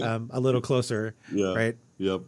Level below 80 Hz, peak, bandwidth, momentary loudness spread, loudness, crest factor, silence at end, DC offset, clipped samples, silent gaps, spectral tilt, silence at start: -70 dBFS; -10 dBFS; 12 kHz; 6 LU; -28 LUFS; 16 dB; 0 s; under 0.1%; under 0.1%; none; -6 dB/octave; 0 s